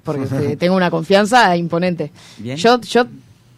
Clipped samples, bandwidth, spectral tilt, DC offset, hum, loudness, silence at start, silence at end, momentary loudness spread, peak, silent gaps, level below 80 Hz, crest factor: under 0.1%; 14.5 kHz; -5.5 dB/octave; under 0.1%; none; -15 LUFS; 0.05 s; 0.4 s; 13 LU; -2 dBFS; none; -56 dBFS; 14 dB